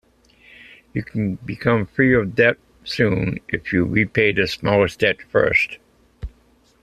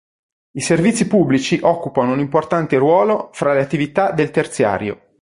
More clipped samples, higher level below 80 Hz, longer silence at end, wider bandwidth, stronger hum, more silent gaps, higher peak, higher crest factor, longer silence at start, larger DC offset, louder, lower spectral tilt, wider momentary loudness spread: neither; first, -44 dBFS vs -52 dBFS; first, 0.55 s vs 0.3 s; first, 13.5 kHz vs 11.5 kHz; neither; neither; about the same, -2 dBFS vs -2 dBFS; about the same, 18 dB vs 14 dB; first, 0.95 s vs 0.55 s; neither; about the same, -19 LUFS vs -17 LUFS; about the same, -6.5 dB/octave vs -5.5 dB/octave; first, 14 LU vs 5 LU